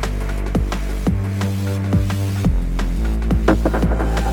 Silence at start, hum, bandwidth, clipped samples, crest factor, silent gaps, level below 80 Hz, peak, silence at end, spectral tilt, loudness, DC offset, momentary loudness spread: 0 s; none; 17 kHz; under 0.1%; 18 dB; none; -22 dBFS; 0 dBFS; 0 s; -7 dB/octave; -20 LUFS; under 0.1%; 5 LU